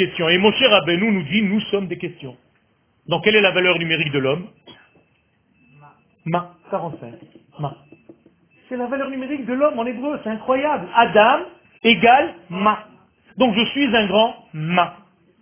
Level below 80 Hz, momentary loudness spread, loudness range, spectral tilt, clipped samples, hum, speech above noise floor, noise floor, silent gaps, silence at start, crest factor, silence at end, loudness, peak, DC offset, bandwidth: -58 dBFS; 17 LU; 14 LU; -9 dB/octave; under 0.1%; none; 44 dB; -62 dBFS; none; 0 s; 20 dB; 0.5 s; -18 LUFS; 0 dBFS; under 0.1%; 3.6 kHz